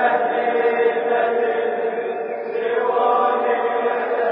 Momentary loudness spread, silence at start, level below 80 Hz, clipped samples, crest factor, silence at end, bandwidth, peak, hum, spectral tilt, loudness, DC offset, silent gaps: 6 LU; 0 s; -80 dBFS; under 0.1%; 14 dB; 0 s; 4.1 kHz; -6 dBFS; none; -8.5 dB/octave; -20 LUFS; under 0.1%; none